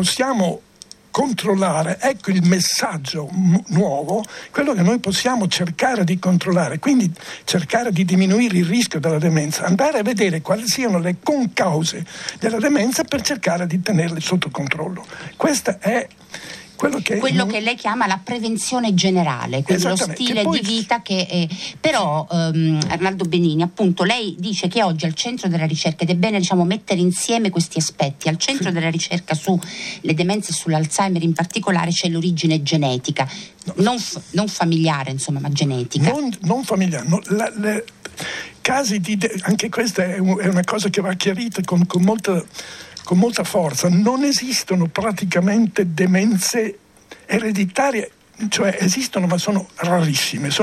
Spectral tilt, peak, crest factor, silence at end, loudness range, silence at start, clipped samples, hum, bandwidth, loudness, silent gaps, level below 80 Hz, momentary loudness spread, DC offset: -5 dB/octave; -2 dBFS; 18 dB; 0 s; 3 LU; 0 s; under 0.1%; none; 14 kHz; -19 LUFS; none; -58 dBFS; 6 LU; under 0.1%